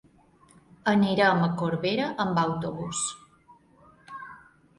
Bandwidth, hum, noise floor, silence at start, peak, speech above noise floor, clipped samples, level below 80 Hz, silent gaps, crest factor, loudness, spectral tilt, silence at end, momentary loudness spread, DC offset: 11.5 kHz; none; -58 dBFS; 0.85 s; -8 dBFS; 33 dB; under 0.1%; -62 dBFS; none; 20 dB; -26 LUFS; -5 dB/octave; 0.4 s; 21 LU; under 0.1%